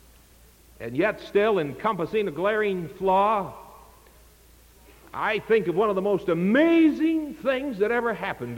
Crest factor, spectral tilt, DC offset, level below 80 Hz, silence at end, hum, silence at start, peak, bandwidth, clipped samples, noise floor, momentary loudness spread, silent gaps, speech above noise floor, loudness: 16 dB; -7 dB/octave; under 0.1%; -56 dBFS; 0 s; none; 0.8 s; -10 dBFS; 17 kHz; under 0.1%; -54 dBFS; 8 LU; none; 30 dB; -24 LUFS